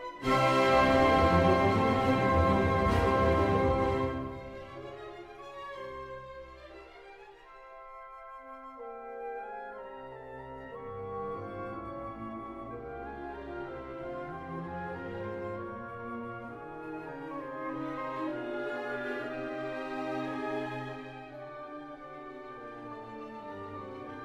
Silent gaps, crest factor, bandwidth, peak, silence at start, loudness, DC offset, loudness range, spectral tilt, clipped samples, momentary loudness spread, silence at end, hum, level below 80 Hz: none; 20 dB; 14.5 kHz; -14 dBFS; 0 s; -31 LUFS; under 0.1%; 19 LU; -7 dB/octave; under 0.1%; 20 LU; 0 s; none; -48 dBFS